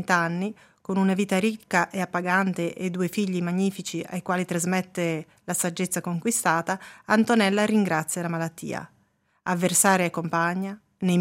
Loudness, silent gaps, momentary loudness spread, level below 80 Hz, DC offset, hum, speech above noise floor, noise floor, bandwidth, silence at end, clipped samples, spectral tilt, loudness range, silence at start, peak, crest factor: -25 LUFS; none; 11 LU; -72 dBFS; under 0.1%; none; 42 dB; -67 dBFS; 16 kHz; 0 s; under 0.1%; -4.5 dB/octave; 3 LU; 0 s; -4 dBFS; 20 dB